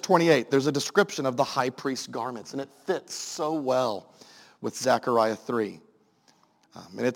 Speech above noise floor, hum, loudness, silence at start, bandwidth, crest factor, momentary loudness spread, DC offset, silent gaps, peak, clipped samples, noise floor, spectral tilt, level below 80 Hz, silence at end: 37 dB; none; -27 LUFS; 0.05 s; 17 kHz; 22 dB; 14 LU; under 0.1%; none; -4 dBFS; under 0.1%; -63 dBFS; -4.5 dB/octave; -76 dBFS; 0 s